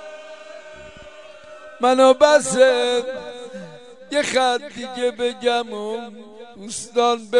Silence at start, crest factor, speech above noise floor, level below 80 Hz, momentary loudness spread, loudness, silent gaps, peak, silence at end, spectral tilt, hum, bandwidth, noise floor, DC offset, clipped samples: 0 s; 20 dB; 23 dB; -62 dBFS; 26 LU; -19 LUFS; none; 0 dBFS; 0 s; -2.5 dB/octave; none; 11 kHz; -42 dBFS; 0.3%; under 0.1%